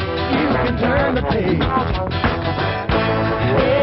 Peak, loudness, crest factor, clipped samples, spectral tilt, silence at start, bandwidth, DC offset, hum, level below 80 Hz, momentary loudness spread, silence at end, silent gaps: -4 dBFS; -18 LUFS; 14 dB; under 0.1%; -5 dB/octave; 0 s; 6 kHz; under 0.1%; none; -30 dBFS; 3 LU; 0 s; none